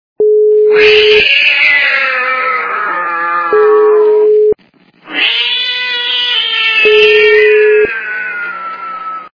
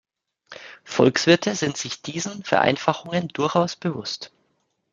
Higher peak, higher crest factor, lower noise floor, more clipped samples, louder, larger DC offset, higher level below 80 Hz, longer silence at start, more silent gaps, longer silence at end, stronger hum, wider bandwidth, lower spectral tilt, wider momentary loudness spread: about the same, 0 dBFS vs -2 dBFS; second, 10 dB vs 22 dB; second, -47 dBFS vs -71 dBFS; first, 0.5% vs under 0.1%; first, -8 LUFS vs -22 LUFS; neither; first, -48 dBFS vs -64 dBFS; second, 0.2 s vs 0.5 s; neither; second, 0.05 s vs 0.65 s; neither; second, 5.4 kHz vs 9.4 kHz; second, -2.5 dB/octave vs -4.5 dB/octave; second, 13 LU vs 16 LU